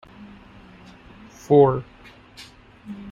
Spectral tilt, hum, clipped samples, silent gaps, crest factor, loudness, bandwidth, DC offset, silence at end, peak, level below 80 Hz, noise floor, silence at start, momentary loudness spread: -8 dB/octave; none; under 0.1%; none; 22 dB; -18 LUFS; 7.6 kHz; under 0.1%; 0 s; -4 dBFS; -54 dBFS; -46 dBFS; 1.5 s; 28 LU